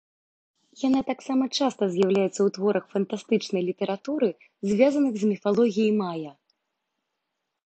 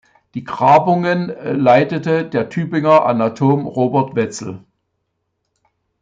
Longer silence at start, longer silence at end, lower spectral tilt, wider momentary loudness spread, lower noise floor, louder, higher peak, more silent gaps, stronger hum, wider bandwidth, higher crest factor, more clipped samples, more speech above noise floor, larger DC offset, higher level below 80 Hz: first, 0.8 s vs 0.35 s; about the same, 1.35 s vs 1.45 s; about the same, -6 dB/octave vs -7 dB/octave; second, 7 LU vs 16 LU; first, -82 dBFS vs -72 dBFS; second, -25 LUFS vs -15 LUFS; second, -6 dBFS vs -2 dBFS; neither; neither; about the same, 8.8 kHz vs 9.2 kHz; about the same, 18 dB vs 16 dB; neither; about the same, 57 dB vs 57 dB; neither; second, -72 dBFS vs -60 dBFS